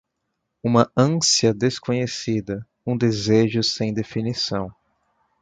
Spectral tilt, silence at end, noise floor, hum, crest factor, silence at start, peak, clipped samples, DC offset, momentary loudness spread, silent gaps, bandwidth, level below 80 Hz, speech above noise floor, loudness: -4.5 dB/octave; 0.7 s; -77 dBFS; none; 20 dB; 0.65 s; -2 dBFS; under 0.1%; under 0.1%; 12 LU; none; 9.4 kHz; -54 dBFS; 56 dB; -21 LUFS